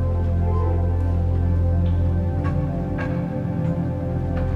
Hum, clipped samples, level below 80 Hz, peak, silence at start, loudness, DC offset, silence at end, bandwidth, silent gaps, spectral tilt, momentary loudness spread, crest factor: none; under 0.1%; -28 dBFS; -10 dBFS; 0 s; -23 LUFS; under 0.1%; 0 s; 3.8 kHz; none; -10.5 dB/octave; 4 LU; 10 dB